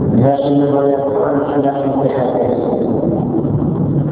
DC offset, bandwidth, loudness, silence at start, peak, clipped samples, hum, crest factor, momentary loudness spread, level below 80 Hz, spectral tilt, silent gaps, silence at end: under 0.1%; 4 kHz; -15 LUFS; 0 s; 0 dBFS; under 0.1%; none; 14 dB; 3 LU; -38 dBFS; -13 dB/octave; none; 0 s